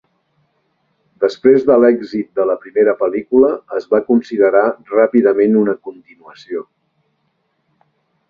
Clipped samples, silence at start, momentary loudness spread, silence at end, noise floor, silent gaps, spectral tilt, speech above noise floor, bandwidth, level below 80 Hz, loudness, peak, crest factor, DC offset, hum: under 0.1%; 1.2 s; 13 LU; 1.65 s; -66 dBFS; none; -8 dB/octave; 52 dB; 6.8 kHz; -58 dBFS; -14 LUFS; 0 dBFS; 16 dB; under 0.1%; none